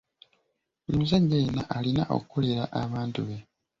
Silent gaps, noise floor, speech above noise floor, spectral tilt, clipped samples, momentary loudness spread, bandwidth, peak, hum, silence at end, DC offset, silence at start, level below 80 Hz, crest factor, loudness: none; -77 dBFS; 50 dB; -8 dB/octave; under 0.1%; 12 LU; 7.6 kHz; -12 dBFS; none; 0.4 s; under 0.1%; 0.9 s; -52 dBFS; 16 dB; -28 LUFS